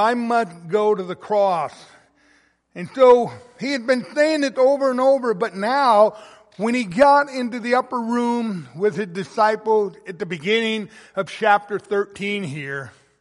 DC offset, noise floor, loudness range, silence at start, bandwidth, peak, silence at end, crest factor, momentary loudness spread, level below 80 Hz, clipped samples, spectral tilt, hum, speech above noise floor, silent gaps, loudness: under 0.1%; -59 dBFS; 4 LU; 0 s; 11.5 kHz; -2 dBFS; 0.3 s; 18 dB; 14 LU; -64 dBFS; under 0.1%; -5 dB/octave; none; 39 dB; none; -20 LUFS